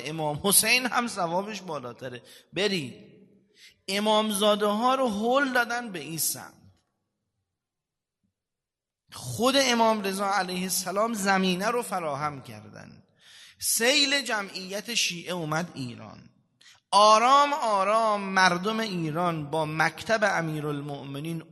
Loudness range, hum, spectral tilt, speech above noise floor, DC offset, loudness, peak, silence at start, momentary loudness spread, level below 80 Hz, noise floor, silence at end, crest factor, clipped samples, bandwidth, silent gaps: 7 LU; none; -3 dB/octave; 63 dB; under 0.1%; -25 LUFS; -4 dBFS; 0 s; 16 LU; -70 dBFS; -89 dBFS; 0.1 s; 24 dB; under 0.1%; 12.5 kHz; none